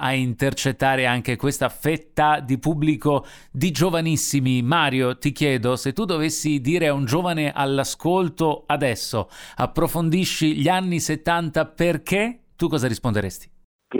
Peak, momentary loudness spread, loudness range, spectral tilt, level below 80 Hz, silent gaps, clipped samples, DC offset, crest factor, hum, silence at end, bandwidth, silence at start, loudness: -4 dBFS; 6 LU; 2 LU; -5 dB/octave; -44 dBFS; 13.64-13.79 s; under 0.1%; under 0.1%; 16 dB; none; 0 s; over 20 kHz; 0 s; -22 LUFS